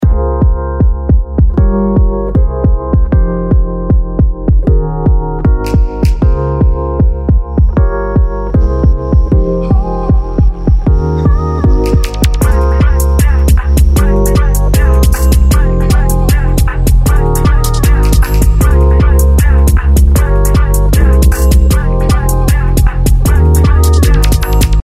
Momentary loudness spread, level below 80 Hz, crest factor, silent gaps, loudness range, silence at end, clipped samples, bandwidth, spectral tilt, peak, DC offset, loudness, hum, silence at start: 4 LU; -10 dBFS; 8 dB; none; 3 LU; 0 s; under 0.1%; 16 kHz; -6.5 dB/octave; 0 dBFS; under 0.1%; -11 LUFS; none; 0 s